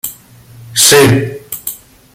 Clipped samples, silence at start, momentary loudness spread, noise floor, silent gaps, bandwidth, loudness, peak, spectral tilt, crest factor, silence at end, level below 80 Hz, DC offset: 0.1%; 0.05 s; 19 LU; -38 dBFS; none; over 20 kHz; -8 LUFS; 0 dBFS; -3 dB/octave; 14 dB; 0.4 s; -42 dBFS; under 0.1%